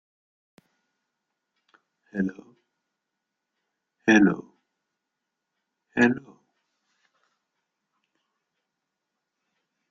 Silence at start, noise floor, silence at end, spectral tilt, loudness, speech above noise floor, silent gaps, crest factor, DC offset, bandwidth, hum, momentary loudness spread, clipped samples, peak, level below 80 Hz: 2.15 s; -84 dBFS; 3.7 s; -6 dB/octave; -24 LUFS; 62 dB; none; 26 dB; under 0.1%; 7.4 kHz; none; 16 LU; under 0.1%; -6 dBFS; -68 dBFS